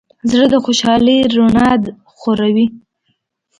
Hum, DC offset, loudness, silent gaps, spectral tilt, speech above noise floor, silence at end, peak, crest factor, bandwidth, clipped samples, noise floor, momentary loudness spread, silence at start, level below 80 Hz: none; under 0.1%; -13 LUFS; none; -5 dB/octave; 54 dB; 0.8 s; 0 dBFS; 14 dB; 9.6 kHz; under 0.1%; -66 dBFS; 8 LU; 0.25 s; -42 dBFS